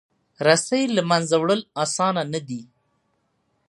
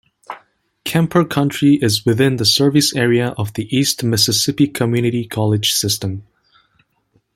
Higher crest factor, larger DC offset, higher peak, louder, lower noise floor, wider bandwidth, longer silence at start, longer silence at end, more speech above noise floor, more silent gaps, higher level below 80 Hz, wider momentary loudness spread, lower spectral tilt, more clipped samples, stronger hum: first, 22 dB vs 16 dB; neither; about the same, -2 dBFS vs 0 dBFS; second, -21 LUFS vs -16 LUFS; first, -70 dBFS vs -62 dBFS; second, 11.5 kHz vs 16.5 kHz; about the same, 0.4 s vs 0.3 s; about the same, 1.05 s vs 1.15 s; about the same, 49 dB vs 46 dB; neither; second, -70 dBFS vs -54 dBFS; second, 10 LU vs 13 LU; about the same, -4 dB/octave vs -4.5 dB/octave; neither; neither